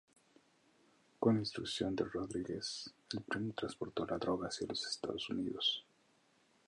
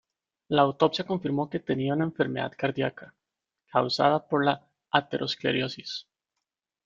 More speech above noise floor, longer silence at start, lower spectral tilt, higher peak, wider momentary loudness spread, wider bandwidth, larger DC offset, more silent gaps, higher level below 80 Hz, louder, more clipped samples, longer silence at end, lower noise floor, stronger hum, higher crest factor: second, 34 dB vs 60 dB; first, 1.2 s vs 0.5 s; second, -4.5 dB/octave vs -6 dB/octave; second, -18 dBFS vs -4 dBFS; about the same, 8 LU vs 9 LU; first, 11.5 kHz vs 7.6 kHz; neither; neither; about the same, -68 dBFS vs -66 dBFS; second, -39 LUFS vs -27 LUFS; neither; about the same, 0.85 s vs 0.85 s; second, -73 dBFS vs -87 dBFS; neither; about the same, 22 dB vs 24 dB